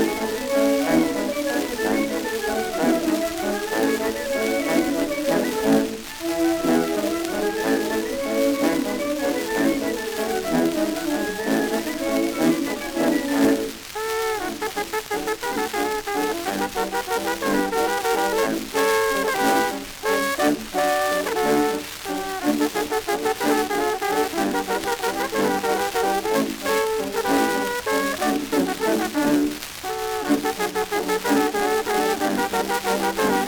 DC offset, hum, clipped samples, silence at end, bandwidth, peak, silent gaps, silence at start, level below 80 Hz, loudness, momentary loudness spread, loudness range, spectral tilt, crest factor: under 0.1%; none; under 0.1%; 0 s; over 20 kHz; -6 dBFS; none; 0 s; -50 dBFS; -23 LUFS; 5 LU; 2 LU; -3.5 dB/octave; 16 dB